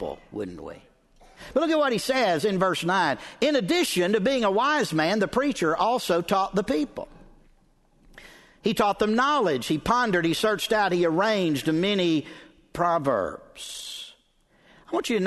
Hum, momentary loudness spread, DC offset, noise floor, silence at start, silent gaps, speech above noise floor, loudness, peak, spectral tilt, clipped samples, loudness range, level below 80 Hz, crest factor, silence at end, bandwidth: none; 13 LU; under 0.1%; -63 dBFS; 0 s; none; 39 dB; -24 LUFS; -8 dBFS; -4.5 dB/octave; under 0.1%; 5 LU; -54 dBFS; 18 dB; 0 s; 12.5 kHz